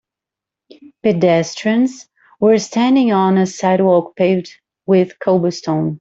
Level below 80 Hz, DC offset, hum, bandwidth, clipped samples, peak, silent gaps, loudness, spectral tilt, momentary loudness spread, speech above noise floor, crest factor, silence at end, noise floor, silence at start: -60 dBFS; under 0.1%; none; 7.8 kHz; under 0.1%; -2 dBFS; none; -15 LUFS; -6.5 dB/octave; 6 LU; 71 dB; 14 dB; 0.05 s; -85 dBFS; 1.05 s